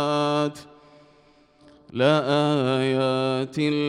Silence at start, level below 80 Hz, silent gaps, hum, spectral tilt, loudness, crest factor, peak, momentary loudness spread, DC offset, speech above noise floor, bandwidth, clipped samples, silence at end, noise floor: 0 s; -66 dBFS; none; none; -6.5 dB/octave; -23 LUFS; 18 dB; -6 dBFS; 7 LU; under 0.1%; 35 dB; 11.5 kHz; under 0.1%; 0 s; -57 dBFS